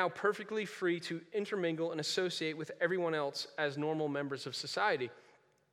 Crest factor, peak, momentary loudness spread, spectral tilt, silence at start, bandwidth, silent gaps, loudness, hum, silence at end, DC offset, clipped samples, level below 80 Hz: 20 dB; -16 dBFS; 6 LU; -4.5 dB/octave; 0 s; 15 kHz; none; -36 LUFS; none; 0.55 s; under 0.1%; under 0.1%; under -90 dBFS